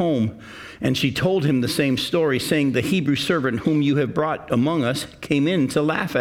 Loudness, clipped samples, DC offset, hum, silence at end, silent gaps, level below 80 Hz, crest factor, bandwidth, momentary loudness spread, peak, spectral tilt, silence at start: -21 LUFS; under 0.1%; under 0.1%; none; 0 s; none; -54 dBFS; 16 dB; 17 kHz; 5 LU; -6 dBFS; -6 dB/octave; 0 s